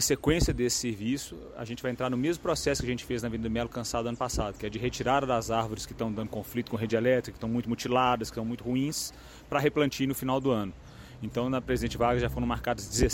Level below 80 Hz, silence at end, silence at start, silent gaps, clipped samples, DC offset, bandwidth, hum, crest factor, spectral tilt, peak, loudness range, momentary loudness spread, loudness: -44 dBFS; 0 s; 0 s; none; under 0.1%; under 0.1%; 16.5 kHz; none; 18 dB; -4.5 dB/octave; -12 dBFS; 2 LU; 9 LU; -30 LUFS